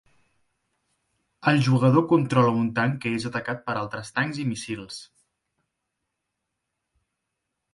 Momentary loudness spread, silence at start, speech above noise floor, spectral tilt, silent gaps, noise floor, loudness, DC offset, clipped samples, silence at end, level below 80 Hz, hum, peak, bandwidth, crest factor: 13 LU; 1.4 s; 58 dB; -6.5 dB/octave; none; -81 dBFS; -24 LUFS; under 0.1%; under 0.1%; 2.7 s; -64 dBFS; none; -6 dBFS; 11.5 kHz; 20 dB